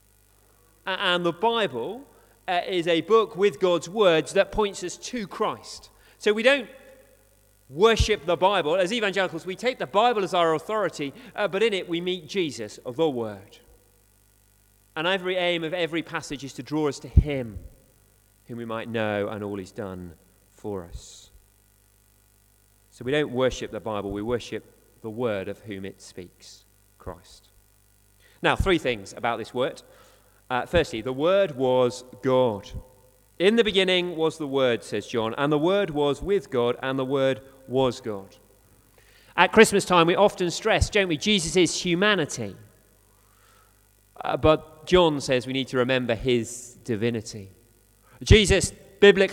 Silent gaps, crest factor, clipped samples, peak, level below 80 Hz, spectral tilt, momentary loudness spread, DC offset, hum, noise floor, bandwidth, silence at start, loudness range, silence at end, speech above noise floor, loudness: none; 24 dB; under 0.1%; 0 dBFS; -40 dBFS; -4.5 dB/octave; 17 LU; under 0.1%; 50 Hz at -55 dBFS; -60 dBFS; 17 kHz; 0.85 s; 11 LU; 0 s; 36 dB; -24 LUFS